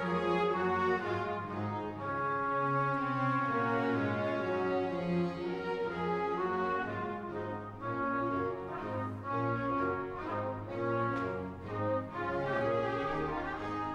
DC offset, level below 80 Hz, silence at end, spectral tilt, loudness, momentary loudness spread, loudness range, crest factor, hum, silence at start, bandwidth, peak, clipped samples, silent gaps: under 0.1%; -58 dBFS; 0 s; -8 dB/octave; -34 LUFS; 7 LU; 3 LU; 14 dB; none; 0 s; 9.6 kHz; -20 dBFS; under 0.1%; none